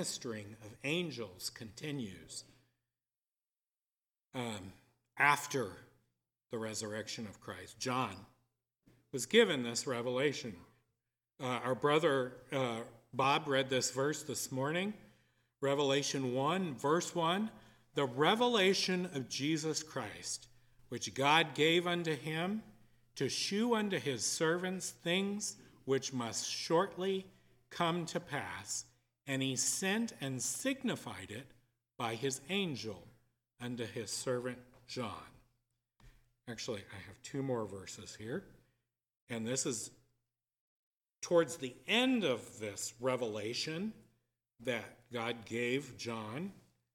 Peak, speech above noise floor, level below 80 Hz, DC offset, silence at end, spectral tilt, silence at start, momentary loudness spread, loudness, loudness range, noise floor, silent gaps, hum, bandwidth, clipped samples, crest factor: -12 dBFS; over 54 dB; -76 dBFS; under 0.1%; 0.35 s; -3.5 dB/octave; 0 s; 16 LU; -36 LUFS; 10 LU; under -90 dBFS; 39.21-39.27 s, 40.60-40.91 s; none; 17.5 kHz; under 0.1%; 26 dB